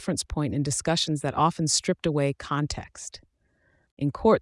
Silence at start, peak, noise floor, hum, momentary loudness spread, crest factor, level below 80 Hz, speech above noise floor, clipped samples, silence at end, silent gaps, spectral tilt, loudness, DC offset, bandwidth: 0 s; -8 dBFS; -67 dBFS; none; 11 LU; 20 dB; -48 dBFS; 42 dB; under 0.1%; 0 s; 3.91-3.97 s; -4.5 dB/octave; -26 LUFS; under 0.1%; 12 kHz